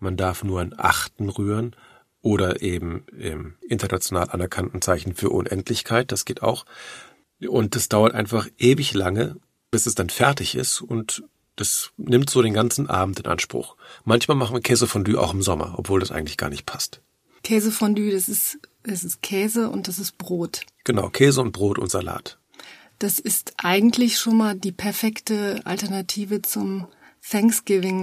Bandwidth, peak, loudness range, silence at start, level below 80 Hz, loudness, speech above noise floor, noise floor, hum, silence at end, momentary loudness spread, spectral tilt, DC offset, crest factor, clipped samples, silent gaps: 15.5 kHz; 0 dBFS; 4 LU; 0 s; -48 dBFS; -22 LUFS; 24 dB; -46 dBFS; none; 0 s; 12 LU; -4.5 dB/octave; under 0.1%; 22 dB; under 0.1%; none